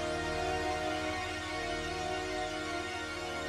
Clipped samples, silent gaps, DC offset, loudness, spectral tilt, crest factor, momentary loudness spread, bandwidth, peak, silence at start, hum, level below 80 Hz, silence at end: under 0.1%; none; under 0.1%; -35 LUFS; -4 dB/octave; 14 dB; 3 LU; 15 kHz; -22 dBFS; 0 s; none; -50 dBFS; 0 s